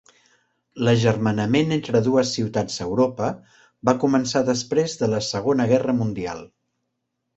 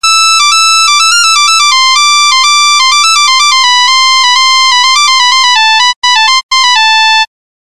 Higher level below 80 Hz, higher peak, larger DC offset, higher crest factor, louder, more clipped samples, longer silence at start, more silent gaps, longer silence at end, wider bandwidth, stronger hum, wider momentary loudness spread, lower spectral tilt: about the same, -54 dBFS vs -50 dBFS; about the same, -2 dBFS vs 0 dBFS; second, under 0.1% vs 4%; first, 20 dB vs 6 dB; second, -22 LUFS vs -4 LUFS; neither; first, 0.75 s vs 0 s; second, none vs 5.96-6.02 s, 6.43-6.49 s; first, 0.9 s vs 0.4 s; second, 8.2 kHz vs 16 kHz; neither; first, 8 LU vs 2 LU; first, -5.5 dB/octave vs 7.5 dB/octave